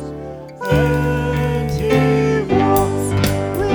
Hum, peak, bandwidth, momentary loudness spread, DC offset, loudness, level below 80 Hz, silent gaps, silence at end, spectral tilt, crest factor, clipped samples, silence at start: none; -4 dBFS; over 20 kHz; 10 LU; under 0.1%; -17 LUFS; -32 dBFS; none; 0 s; -6.5 dB/octave; 12 dB; under 0.1%; 0 s